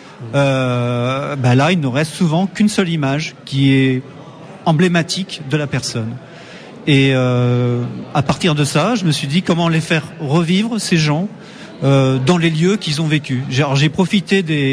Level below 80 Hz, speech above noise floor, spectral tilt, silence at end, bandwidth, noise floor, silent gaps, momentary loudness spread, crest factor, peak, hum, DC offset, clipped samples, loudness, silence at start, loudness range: -50 dBFS; 20 dB; -6 dB/octave; 0 s; 11 kHz; -35 dBFS; none; 9 LU; 14 dB; -2 dBFS; none; under 0.1%; under 0.1%; -16 LUFS; 0 s; 2 LU